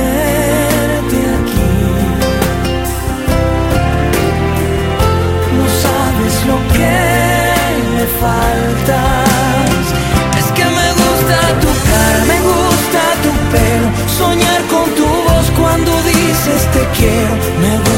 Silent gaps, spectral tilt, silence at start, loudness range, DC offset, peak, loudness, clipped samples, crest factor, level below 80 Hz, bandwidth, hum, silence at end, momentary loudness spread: none; -5 dB/octave; 0 s; 3 LU; under 0.1%; 0 dBFS; -12 LUFS; under 0.1%; 12 dB; -20 dBFS; 16.5 kHz; none; 0 s; 3 LU